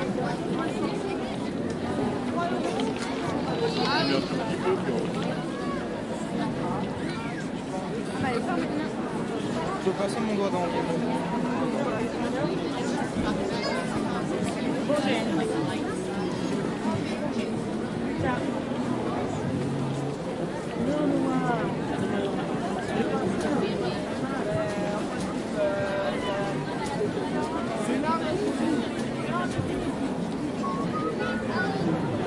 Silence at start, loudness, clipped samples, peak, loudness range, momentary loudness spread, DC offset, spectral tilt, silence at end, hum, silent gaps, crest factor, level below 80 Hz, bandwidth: 0 s; -28 LUFS; under 0.1%; -12 dBFS; 2 LU; 4 LU; under 0.1%; -6 dB/octave; 0 s; none; none; 16 dB; -52 dBFS; 11.5 kHz